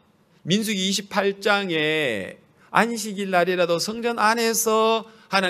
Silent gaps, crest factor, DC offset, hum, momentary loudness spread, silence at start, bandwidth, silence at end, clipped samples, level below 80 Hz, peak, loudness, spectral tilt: none; 22 dB; under 0.1%; none; 6 LU; 0.45 s; 15.5 kHz; 0 s; under 0.1%; -70 dBFS; -2 dBFS; -22 LUFS; -3 dB/octave